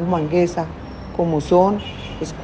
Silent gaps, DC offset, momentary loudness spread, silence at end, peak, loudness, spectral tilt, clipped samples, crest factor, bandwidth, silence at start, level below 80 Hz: none; under 0.1%; 14 LU; 0 s; -2 dBFS; -20 LUFS; -7 dB/octave; under 0.1%; 18 dB; 8.8 kHz; 0 s; -40 dBFS